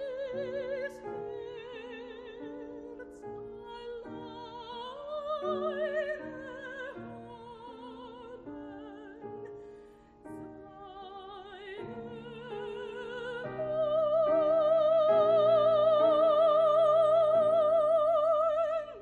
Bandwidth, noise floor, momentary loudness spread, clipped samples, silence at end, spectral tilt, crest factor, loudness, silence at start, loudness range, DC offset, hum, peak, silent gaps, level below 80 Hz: 4.7 kHz; -55 dBFS; 22 LU; under 0.1%; 0 s; -6.5 dB/octave; 14 dB; -28 LUFS; 0 s; 22 LU; under 0.1%; none; -16 dBFS; none; -66 dBFS